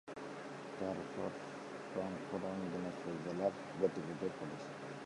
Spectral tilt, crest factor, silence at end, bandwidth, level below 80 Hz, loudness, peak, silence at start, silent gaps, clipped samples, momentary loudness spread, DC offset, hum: -6.5 dB/octave; 22 dB; 0 s; 11.5 kHz; -74 dBFS; -43 LUFS; -20 dBFS; 0.05 s; none; under 0.1%; 9 LU; under 0.1%; none